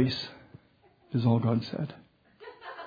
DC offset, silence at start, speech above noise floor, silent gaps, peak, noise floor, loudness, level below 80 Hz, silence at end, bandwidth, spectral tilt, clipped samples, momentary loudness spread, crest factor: under 0.1%; 0 s; 35 dB; none; -12 dBFS; -63 dBFS; -30 LUFS; -66 dBFS; 0 s; 5 kHz; -8 dB/octave; under 0.1%; 21 LU; 20 dB